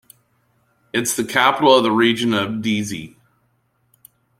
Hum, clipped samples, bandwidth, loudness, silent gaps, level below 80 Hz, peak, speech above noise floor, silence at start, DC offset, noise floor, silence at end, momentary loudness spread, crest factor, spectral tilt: none; under 0.1%; 16 kHz; -17 LUFS; none; -60 dBFS; -2 dBFS; 47 dB; 0.95 s; under 0.1%; -64 dBFS; 1.3 s; 11 LU; 18 dB; -3.5 dB/octave